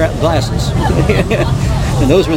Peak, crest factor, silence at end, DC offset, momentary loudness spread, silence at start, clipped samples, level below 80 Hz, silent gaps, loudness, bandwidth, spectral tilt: 0 dBFS; 12 dB; 0 s; under 0.1%; 3 LU; 0 s; under 0.1%; -20 dBFS; none; -13 LUFS; 16.5 kHz; -6.5 dB/octave